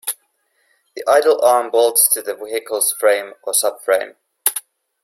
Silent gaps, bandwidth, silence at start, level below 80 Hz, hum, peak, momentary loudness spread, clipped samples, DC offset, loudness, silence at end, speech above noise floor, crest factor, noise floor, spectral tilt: none; 16.5 kHz; 0.05 s; -72 dBFS; none; 0 dBFS; 13 LU; under 0.1%; under 0.1%; -16 LUFS; 0.45 s; 48 dB; 18 dB; -64 dBFS; 1 dB/octave